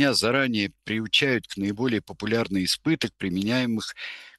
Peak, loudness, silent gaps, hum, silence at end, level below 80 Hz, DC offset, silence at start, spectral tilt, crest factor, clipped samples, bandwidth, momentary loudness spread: -6 dBFS; -25 LUFS; none; none; 0.1 s; -60 dBFS; under 0.1%; 0 s; -4 dB/octave; 18 dB; under 0.1%; 12.5 kHz; 9 LU